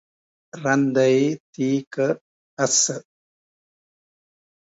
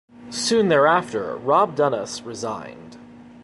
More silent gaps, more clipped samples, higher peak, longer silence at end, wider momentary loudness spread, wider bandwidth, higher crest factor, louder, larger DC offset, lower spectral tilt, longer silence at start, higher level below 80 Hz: first, 1.40-1.53 s, 1.87-1.91 s, 2.21-2.57 s vs none; neither; about the same, -6 dBFS vs -4 dBFS; first, 1.75 s vs 0 s; second, 9 LU vs 15 LU; second, 8 kHz vs 11.5 kHz; about the same, 20 dB vs 18 dB; about the same, -21 LUFS vs -21 LUFS; neither; about the same, -3.5 dB/octave vs -4 dB/octave; first, 0.55 s vs 0.2 s; second, -72 dBFS vs -62 dBFS